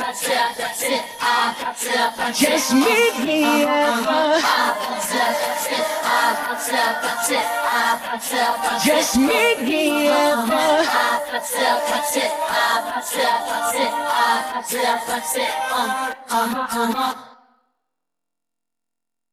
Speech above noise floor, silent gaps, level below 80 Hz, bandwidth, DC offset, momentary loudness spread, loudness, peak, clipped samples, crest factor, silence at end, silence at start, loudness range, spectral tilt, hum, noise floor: 68 dB; none; -58 dBFS; 16 kHz; under 0.1%; 6 LU; -19 LUFS; -4 dBFS; under 0.1%; 16 dB; 2 s; 0 s; 5 LU; -1.5 dB/octave; none; -87 dBFS